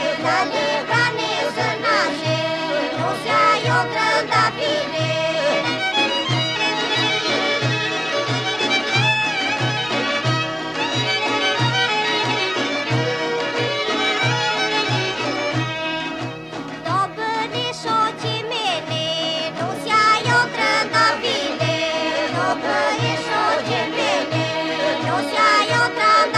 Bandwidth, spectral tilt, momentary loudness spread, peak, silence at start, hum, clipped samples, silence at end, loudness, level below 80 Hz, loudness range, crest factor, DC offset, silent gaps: 13 kHz; -4 dB/octave; 6 LU; -6 dBFS; 0 s; none; under 0.1%; 0 s; -19 LUFS; -58 dBFS; 4 LU; 14 dB; under 0.1%; none